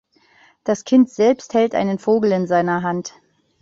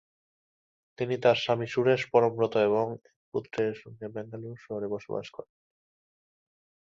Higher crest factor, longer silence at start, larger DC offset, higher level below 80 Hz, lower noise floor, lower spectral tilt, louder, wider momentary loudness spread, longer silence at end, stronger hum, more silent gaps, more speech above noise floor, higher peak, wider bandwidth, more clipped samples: second, 14 dB vs 22 dB; second, 0.65 s vs 1 s; neither; first, -60 dBFS vs -70 dBFS; second, -54 dBFS vs under -90 dBFS; about the same, -6.5 dB/octave vs -6.5 dB/octave; first, -18 LUFS vs -28 LUFS; second, 10 LU vs 16 LU; second, 0.55 s vs 1.4 s; neither; second, none vs 3.16-3.32 s; second, 37 dB vs over 62 dB; first, -4 dBFS vs -8 dBFS; about the same, 7.6 kHz vs 7.6 kHz; neither